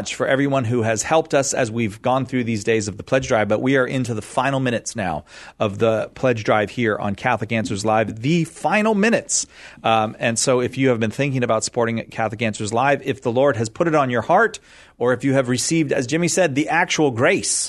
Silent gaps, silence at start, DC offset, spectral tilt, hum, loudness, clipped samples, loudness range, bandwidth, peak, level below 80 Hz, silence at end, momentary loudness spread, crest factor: none; 0 s; under 0.1%; -4.5 dB/octave; none; -20 LUFS; under 0.1%; 2 LU; 12.5 kHz; -2 dBFS; -54 dBFS; 0 s; 6 LU; 18 dB